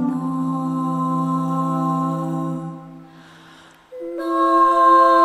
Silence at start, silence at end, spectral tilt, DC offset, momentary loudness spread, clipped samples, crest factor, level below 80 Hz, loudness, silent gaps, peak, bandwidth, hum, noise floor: 0 s; 0 s; -7.5 dB/octave; under 0.1%; 17 LU; under 0.1%; 16 dB; -66 dBFS; -19 LUFS; none; -4 dBFS; 13.5 kHz; none; -47 dBFS